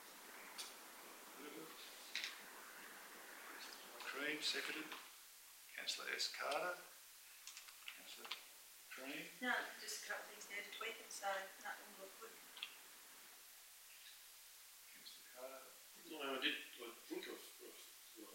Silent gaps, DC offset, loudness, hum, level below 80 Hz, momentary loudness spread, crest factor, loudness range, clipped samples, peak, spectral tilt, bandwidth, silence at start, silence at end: none; under 0.1%; -49 LUFS; none; under -90 dBFS; 16 LU; 26 dB; 10 LU; under 0.1%; -26 dBFS; 0 dB/octave; 16 kHz; 0 s; 0 s